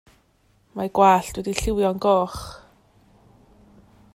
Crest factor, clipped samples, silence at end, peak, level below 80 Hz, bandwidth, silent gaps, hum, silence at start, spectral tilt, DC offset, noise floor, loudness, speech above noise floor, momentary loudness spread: 20 dB; under 0.1%; 1.55 s; -4 dBFS; -42 dBFS; 16 kHz; none; none; 0.75 s; -5 dB/octave; under 0.1%; -62 dBFS; -21 LUFS; 41 dB; 19 LU